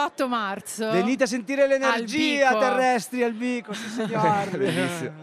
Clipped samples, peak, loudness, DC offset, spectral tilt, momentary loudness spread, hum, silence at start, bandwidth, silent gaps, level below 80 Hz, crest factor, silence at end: under 0.1%; -8 dBFS; -23 LUFS; under 0.1%; -4.5 dB/octave; 9 LU; none; 0 s; 14.5 kHz; none; -70 dBFS; 16 dB; 0 s